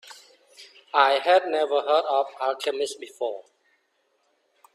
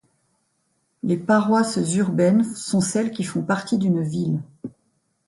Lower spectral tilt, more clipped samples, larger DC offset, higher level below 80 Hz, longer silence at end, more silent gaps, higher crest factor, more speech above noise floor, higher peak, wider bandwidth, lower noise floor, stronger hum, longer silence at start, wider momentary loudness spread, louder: second, -1 dB/octave vs -6 dB/octave; neither; neither; second, -80 dBFS vs -62 dBFS; first, 1.35 s vs 0.6 s; neither; first, 22 dB vs 16 dB; about the same, 47 dB vs 49 dB; about the same, -4 dBFS vs -6 dBFS; first, 13 kHz vs 11.5 kHz; about the same, -70 dBFS vs -70 dBFS; neither; second, 0.05 s vs 1.05 s; about the same, 12 LU vs 11 LU; second, -24 LUFS vs -21 LUFS